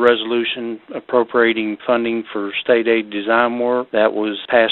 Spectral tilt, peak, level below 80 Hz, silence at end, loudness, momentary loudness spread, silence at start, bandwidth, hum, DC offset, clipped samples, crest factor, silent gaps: -7 dB/octave; 0 dBFS; -60 dBFS; 0 s; -18 LUFS; 8 LU; 0 s; 4.2 kHz; none; under 0.1%; under 0.1%; 18 dB; none